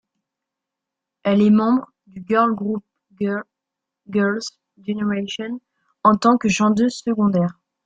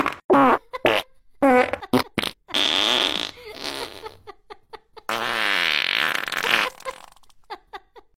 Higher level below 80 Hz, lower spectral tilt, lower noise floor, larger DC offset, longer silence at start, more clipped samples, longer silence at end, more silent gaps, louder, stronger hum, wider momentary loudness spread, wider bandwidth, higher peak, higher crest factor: about the same, -60 dBFS vs -56 dBFS; first, -6 dB/octave vs -3 dB/octave; first, -84 dBFS vs -48 dBFS; neither; first, 1.25 s vs 0 s; neither; first, 0.35 s vs 0.2 s; second, none vs 0.24-0.29 s; about the same, -20 LUFS vs -21 LUFS; neither; second, 14 LU vs 19 LU; second, 9 kHz vs 16.5 kHz; about the same, -2 dBFS vs -4 dBFS; about the same, 18 dB vs 20 dB